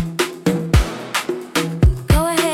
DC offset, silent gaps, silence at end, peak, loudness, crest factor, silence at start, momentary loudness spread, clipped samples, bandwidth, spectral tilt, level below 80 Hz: under 0.1%; none; 0 s; -4 dBFS; -19 LUFS; 14 dB; 0 s; 7 LU; under 0.1%; 17.5 kHz; -5 dB/octave; -22 dBFS